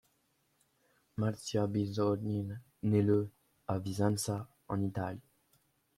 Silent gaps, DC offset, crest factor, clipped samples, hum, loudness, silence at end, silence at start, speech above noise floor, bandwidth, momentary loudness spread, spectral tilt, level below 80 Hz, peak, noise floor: none; under 0.1%; 18 dB; under 0.1%; none; -35 LUFS; 0.75 s; 1.15 s; 43 dB; 14.5 kHz; 12 LU; -6.5 dB/octave; -68 dBFS; -16 dBFS; -76 dBFS